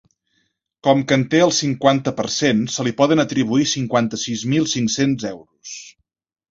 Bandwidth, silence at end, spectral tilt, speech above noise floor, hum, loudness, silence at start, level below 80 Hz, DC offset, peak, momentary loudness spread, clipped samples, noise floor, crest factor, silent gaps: 7.8 kHz; 0.6 s; -4.5 dB/octave; 50 dB; none; -18 LUFS; 0.85 s; -56 dBFS; under 0.1%; 0 dBFS; 13 LU; under 0.1%; -68 dBFS; 18 dB; none